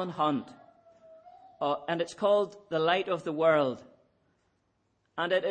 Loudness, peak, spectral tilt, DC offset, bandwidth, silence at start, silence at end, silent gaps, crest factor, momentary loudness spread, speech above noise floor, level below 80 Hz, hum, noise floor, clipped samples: -29 LUFS; -12 dBFS; -5.5 dB/octave; under 0.1%; 9.4 kHz; 0 s; 0 s; none; 18 dB; 10 LU; 46 dB; -78 dBFS; none; -74 dBFS; under 0.1%